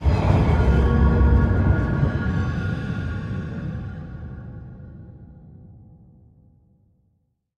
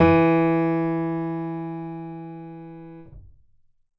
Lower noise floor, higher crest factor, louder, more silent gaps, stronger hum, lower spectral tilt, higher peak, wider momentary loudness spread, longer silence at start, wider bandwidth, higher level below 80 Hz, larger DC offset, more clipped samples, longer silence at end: first, -69 dBFS vs -58 dBFS; about the same, 18 dB vs 18 dB; about the same, -21 LUFS vs -23 LUFS; neither; neither; second, -9 dB/octave vs -10.5 dB/octave; about the same, -6 dBFS vs -6 dBFS; about the same, 21 LU vs 23 LU; about the same, 0 s vs 0 s; first, 6.6 kHz vs 5.6 kHz; first, -26 dBFS vs -46 dBFS; neither; neither; first, 1.85 s vs 0.75 s